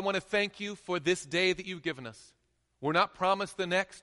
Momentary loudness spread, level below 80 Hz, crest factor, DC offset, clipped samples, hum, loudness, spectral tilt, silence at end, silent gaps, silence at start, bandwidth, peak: 9 LU; -66 dBFS; 18 dB; under 0.1%; under 0.1%; none; -31 LUFS; -4 dB/octave; 0.05 s; none; 0 s; 11.5 kHz; -12 dBFS